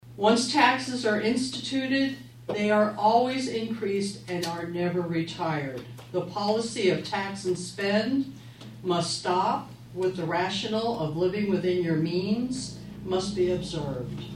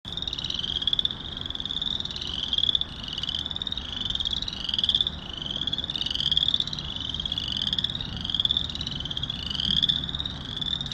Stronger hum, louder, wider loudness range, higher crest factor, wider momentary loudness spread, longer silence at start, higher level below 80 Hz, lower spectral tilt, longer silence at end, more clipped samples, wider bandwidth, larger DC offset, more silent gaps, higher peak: neither; about the same, -27 LUFS vs -26 LUFS; about the same, 4 LU vs 2 LU; about the same, 20 dB vs 22 dB; first, 11 LU vs 8 LU; about the same, 0.05 s vs 0.05 s; second, -58 dBFS vs -44 dBFS; first, -5 dB/octave vs -3 dB/octave; about the same, 0 s vs 0 s; neither; about the same, 15 kHz vs 14.5 kHz; neither; neither; about the same, -6 dBFS vs -8 dBFS